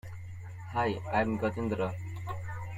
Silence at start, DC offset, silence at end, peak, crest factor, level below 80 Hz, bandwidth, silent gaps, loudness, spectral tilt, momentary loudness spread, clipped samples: 0.05 s; under 0.1%; 0 s; -14 dBFS; 20 dB; -56 dBFS; 13.5 kHz; none; -33 LUFS; -7.5 dB/octave; 14 LU; under 0.1%